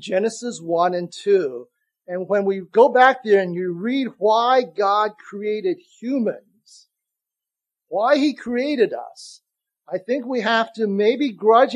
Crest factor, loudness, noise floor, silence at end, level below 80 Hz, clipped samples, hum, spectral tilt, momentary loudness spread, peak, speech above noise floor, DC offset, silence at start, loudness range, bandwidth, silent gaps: 20 dB; -20 LUFS; -87 dBFS; 0 s; -74 dBFS; under 0.1%; none; -5 dB/octave; 14 LU; 0 dBFS; 68 dB; under 0.1%; 0 s; 6 LU; 11 kHz; none